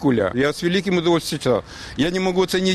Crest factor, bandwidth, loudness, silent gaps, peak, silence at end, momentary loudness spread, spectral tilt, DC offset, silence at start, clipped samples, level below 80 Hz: 12 dB; 13.5 kHz; -20 LUFS; none; -8 dBFS; 0 s; 4 LU; -5 dB/octave; under 0.1%; 0 s; under 0.1%; -46 dBFS